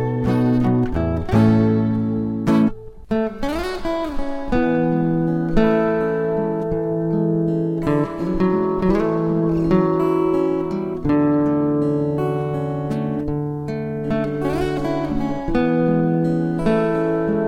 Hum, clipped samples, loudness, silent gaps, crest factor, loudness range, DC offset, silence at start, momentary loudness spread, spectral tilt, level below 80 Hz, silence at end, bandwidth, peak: none; under 0.1%; -20 LUFS; none; 16 dB; 3 LU; under 0.1%; 0 s; 7 LU; -9 dB/octave; -36 dBFS; 0 s; 11 kHz; -4 dBFS